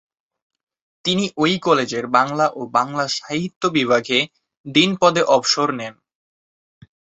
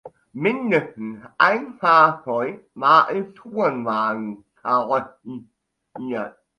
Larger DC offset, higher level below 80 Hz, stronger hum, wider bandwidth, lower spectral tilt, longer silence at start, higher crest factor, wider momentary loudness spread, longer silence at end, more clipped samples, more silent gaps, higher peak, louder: neither; first, -62 dBFS vs -68 dBFS; neither; second, 8.2 kHz vs 10.5 kHz; second, -4 dB/octave vs -6.5 dB/octave; first, 1.05 s vs 0.05 s; about the same, 20 dB vs 20 dB; second, 7 LU vs 19 LU; first, 1.3 s vs 0.3 s; neither; first, 3.56-3.61 s, 4.57-4.64 s vs none; about the same, -2 dBFS vs 0 dBFS; about the same, -18 LUFS vs -20 LUFS